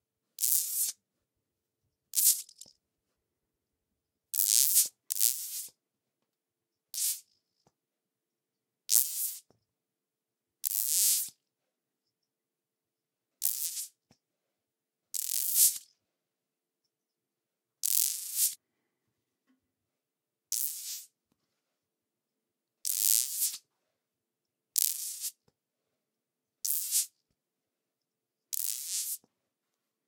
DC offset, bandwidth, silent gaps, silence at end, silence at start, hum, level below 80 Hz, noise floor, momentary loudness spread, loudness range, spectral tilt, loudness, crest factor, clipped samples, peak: under 0.1%; 19 kHz; none; 0.9 s; 0.4 s; none; under -90 dBFS; -89 dBFS; 15 LU; 10 LU; 5.5 dB/octave; -28 LUFS; 36 dB; under 0.1%; 0 dBFS